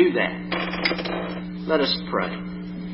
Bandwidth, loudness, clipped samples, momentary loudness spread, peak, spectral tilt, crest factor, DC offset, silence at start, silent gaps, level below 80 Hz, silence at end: 5.8 kHz; -25 LUFS; under 0.1%; 10 LU; -6 dBFS; -9.5 dB/octave; 18 dB; under 0.1%; 0 s; none; -48 dBFS; 0 s